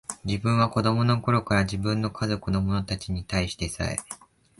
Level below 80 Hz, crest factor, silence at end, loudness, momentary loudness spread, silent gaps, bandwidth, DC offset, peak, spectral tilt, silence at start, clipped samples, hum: -42 dBFS; 18 dB; 0.45 s; -26 LUFS; 8 LU; none; 11.5 kHz; under 0.1%; -8 dBFS; -5.5 dB/octave; 0.1 s; under 0.1%; none